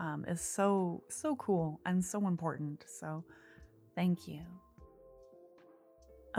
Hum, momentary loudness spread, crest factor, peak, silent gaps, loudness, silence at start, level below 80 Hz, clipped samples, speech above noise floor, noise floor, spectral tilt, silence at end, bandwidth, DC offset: none; 16 LU; 20 dB; -18 dBFS; none; -36 LUFS; 0 s; -68 dBFS; under 0.1%; 26 dB; -62 dBFS; -6 dB/octave; 0 s; 15 kHz; under 0.1%